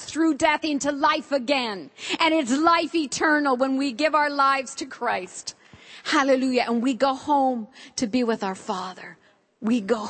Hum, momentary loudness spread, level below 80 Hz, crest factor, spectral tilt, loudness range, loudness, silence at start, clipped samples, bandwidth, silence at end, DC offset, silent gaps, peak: none; 13 LU; -64 dBFS; 18 dB; -3 dB/octave; 3 LU; -23 LUFS; 0 s; under 0.1%; 8.8 kHz; 0 s; under 0.1%; none; -4 dBFS